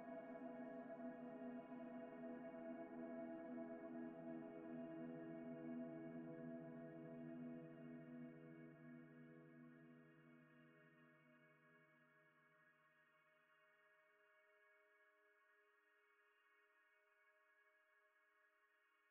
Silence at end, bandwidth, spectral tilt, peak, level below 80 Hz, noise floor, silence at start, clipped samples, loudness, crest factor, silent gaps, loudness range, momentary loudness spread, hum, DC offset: 0 s; 3.3 kHz; -4.5 dB/octave; -42 dBFS; under -90 dBFS; -81 dBFS; 0 s; under 0.1%; -56 LUFS; 16 dB; none; 12 LU; 11 LU; none; under 0.1%